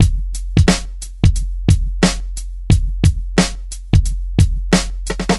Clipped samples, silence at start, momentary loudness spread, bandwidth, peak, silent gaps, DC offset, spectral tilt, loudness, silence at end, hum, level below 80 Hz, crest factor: under 0.1%; 0 s; 10 LU; 12 kHz; 0 dBFS; none; under 0.1%; -5.5 dB/octave; -17 LUFS; 0 s; none; -20 dBFS; 16 dB